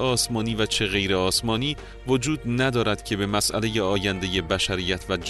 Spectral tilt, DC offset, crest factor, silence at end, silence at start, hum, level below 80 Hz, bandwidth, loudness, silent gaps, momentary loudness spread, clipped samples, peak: -4 dB/octave; under 0.1%; 16 dB; 0 s; 0 s; none; -42 dBFS; 12.5 kHz; -24 LUFS; none; 4 LU; under 0.1%; -8 dBFS